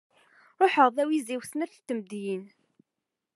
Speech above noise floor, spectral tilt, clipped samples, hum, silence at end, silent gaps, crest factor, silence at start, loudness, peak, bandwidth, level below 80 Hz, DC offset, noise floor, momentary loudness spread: 59 dB; -4.5 dB/octave; under 0.1%; none; 0.9 s; none; 22 dB; 0.6 s; -27 LUFS; -6 dBFS; 13 kHz; under -90 dBFS; under 0.1%; -86 dBFS; 14 LU